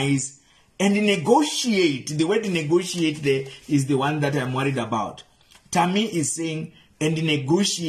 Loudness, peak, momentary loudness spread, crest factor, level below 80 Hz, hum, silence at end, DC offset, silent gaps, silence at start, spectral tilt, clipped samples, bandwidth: -22 LUFS; -4 dBFS; 8 LU; 18 dB; -60 dBFS; none; 0 s; under 0.1%; none; 0 s; -4.5 dB/octave; under 0.1%; 13.5 kHz